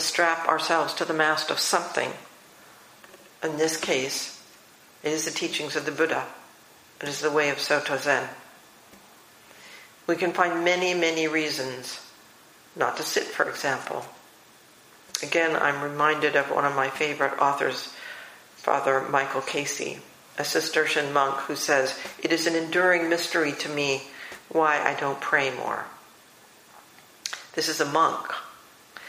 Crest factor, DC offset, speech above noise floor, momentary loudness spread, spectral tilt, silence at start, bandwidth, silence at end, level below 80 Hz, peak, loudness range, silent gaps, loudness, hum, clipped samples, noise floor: 24 dB; under 0.1%; 28 dB; 14 LU; -2.5 dB/octave; 0 s; 15.5 kHz; 0 s; -74 dBFS; -2 dBFS; 5 LU; none; -25 LUFS; none; under 0.1%; -53 dBFS